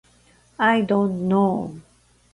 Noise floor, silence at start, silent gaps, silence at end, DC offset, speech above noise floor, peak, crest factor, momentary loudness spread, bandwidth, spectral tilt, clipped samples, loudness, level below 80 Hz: -57 dBFS; 0.6 s; none; 0.55 s; under 0.1%; 37 dB; -6 dBFS; 16 dB; 8 LU; 11 kHz; -7.5 dB/octave; under 0.1%; -21 LUFS; -58 dBFS